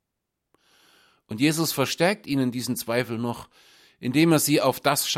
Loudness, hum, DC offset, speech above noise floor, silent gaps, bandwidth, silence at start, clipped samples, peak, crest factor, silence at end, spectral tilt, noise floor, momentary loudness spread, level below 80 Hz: -23 LUFS; none; under 0.1%; 58 dB; none; 16.5 kHz; 1.3 s; under 0.1%; -4 dBFS; 20 dB; 0 s; -4 dB/octave; -82 dBFS; 12 LU; -64 dBFS